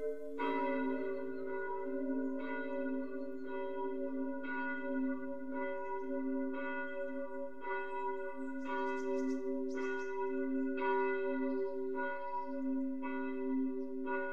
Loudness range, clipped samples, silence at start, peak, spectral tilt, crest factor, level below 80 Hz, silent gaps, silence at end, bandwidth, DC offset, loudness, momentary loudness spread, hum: 3 LU; under 0.1%; 0 s; -24 dBFS; -6 dB/octave; 14 dB; -80 dBFS; none; 0 s; 7.2 kHz; 0.6%; -39 LUFS; 6 LU; none